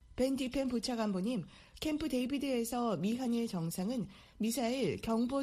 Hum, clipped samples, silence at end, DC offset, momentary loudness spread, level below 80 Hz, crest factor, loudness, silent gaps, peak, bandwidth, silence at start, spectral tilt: none; under 0.1%; 0 s; under 0.1%; 5 LU; -60 dBFS; 14 dB; -36 LUFS; none; -20 dBFS; 15 kHz; 0.1 s; -5.5 dB/octave